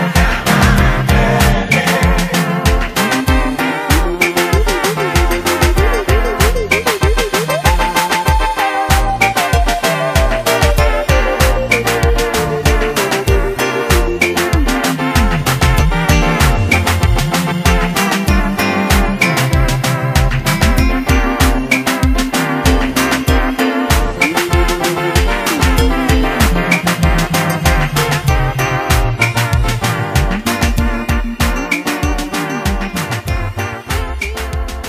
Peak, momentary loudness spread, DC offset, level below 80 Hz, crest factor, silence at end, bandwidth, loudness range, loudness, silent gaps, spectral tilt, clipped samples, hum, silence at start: 0 dBFS; 4 LU; under 0.1%; -18 dBFS; 12 dB; 0 s; 15.5 kHz; 2 LU; -14 LUFS; none; -4.5 dB/octave; under 0.1%; none; 0 s